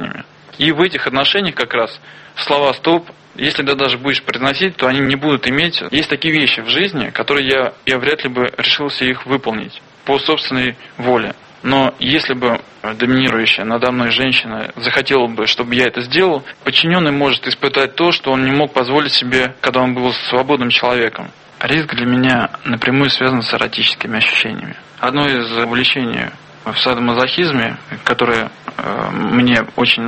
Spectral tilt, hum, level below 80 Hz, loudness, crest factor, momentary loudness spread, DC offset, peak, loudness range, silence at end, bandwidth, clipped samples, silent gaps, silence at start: -5 dB/octave; none; -50 dBFS; -15 LUFS; 16 dB; 8 LU; under 0.1%; 0 dBFS; 3 LU; 0 s; 8.8 kHz; under 0.1%; none; 0 s